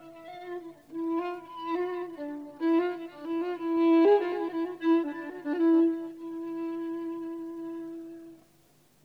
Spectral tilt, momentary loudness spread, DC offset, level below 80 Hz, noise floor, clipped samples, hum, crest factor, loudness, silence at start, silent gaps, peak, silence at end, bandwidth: -6.5 dB/octave; 17 LU; under 0.1%; -76 dBFS; -63 dBFS; under 0.1%; none; 18 dB; -29 LUFS; 0 s; none; -12 dBFS; 0.7 s; 4.9 kHz